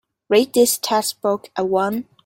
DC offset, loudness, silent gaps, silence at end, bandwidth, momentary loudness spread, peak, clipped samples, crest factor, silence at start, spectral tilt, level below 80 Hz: under 0.1%; -19 LUFS; none; 0.25 s; 17 kHz; 7 LU; -2 dBFS; under 0.1%; 18 dB; 0.3 s; -3 dB/octave; -64 dBFS